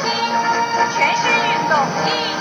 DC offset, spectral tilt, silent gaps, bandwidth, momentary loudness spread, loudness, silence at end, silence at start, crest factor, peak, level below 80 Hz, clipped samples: under 0.1%; -2.5 dB/octave; none; 14 kHz; 3 LU; -17 LUFS; 0 s; 0 s; 16 dB; -2 dBFS; -60 dBFS; under 0.1%